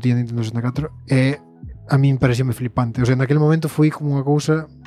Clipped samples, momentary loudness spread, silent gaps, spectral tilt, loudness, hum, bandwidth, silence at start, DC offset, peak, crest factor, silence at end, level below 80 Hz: under 0.1%; 7 LU; none; -7.5 dB/octave; -19 LUFS; none; 13.5 kHz; 0 s; under 0.1%; -2 dBFS; 16 dB; 0 s; -44 dBFS